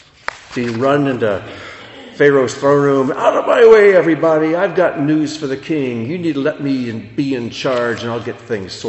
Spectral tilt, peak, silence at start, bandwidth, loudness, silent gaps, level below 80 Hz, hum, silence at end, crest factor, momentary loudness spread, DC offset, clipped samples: -6 dB/octave; 0 dBFS; 0.3 s; 8.4 kHz; -15 LUFS; none; -54 dBFS; none; 0 s; 14 dB; 14 LU; under 0.1%; under 0.1%